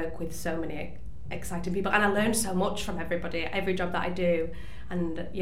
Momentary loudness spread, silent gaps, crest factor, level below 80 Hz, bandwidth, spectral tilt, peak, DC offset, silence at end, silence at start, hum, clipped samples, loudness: 14 LU; none; 22 dB; -46 dBFS; 16 kHz; -4.5 dB/octave; -8 dBFS; 2%; 0 s; 0 s; none; under 0.1%; -30 LUFS